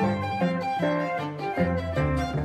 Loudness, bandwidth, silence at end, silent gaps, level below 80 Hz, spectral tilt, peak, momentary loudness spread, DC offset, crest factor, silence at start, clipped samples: -27 LUFS; 12.5 kHz; 0 s; none; -42 dBFS; -7.5 dB/octave; -10 dBFS; 3 LU; under 0.1%; 16 dB; 0 s; under 0.1%